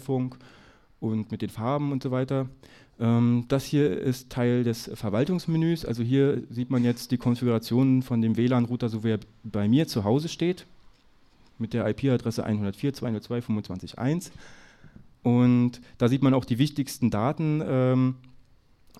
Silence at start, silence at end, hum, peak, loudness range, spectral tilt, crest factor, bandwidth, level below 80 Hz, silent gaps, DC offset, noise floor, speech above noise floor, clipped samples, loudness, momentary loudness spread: 0 s; 0.8 s; none; -10 dBFS; 5 LU; -7.5 dB/octave; 16 dB; 14 kHz; -56 dBFS; none; under 0.1%; -58 dBFS; 32 dB; under 0.1%; -26 LUFS; 8 LU